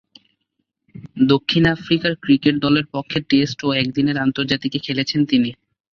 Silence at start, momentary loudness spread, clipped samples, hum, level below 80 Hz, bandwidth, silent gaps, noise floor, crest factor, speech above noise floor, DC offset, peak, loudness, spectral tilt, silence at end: 0.95 s; 6 LU; under 0.1%; none; -52 dBFS; 6.8 kHz; none; -74 dBFS; 18 dB; 56 dB; under 0.1%; -2 dBFS; -18 LUFS; -6.5 dB/octave; 0.4 s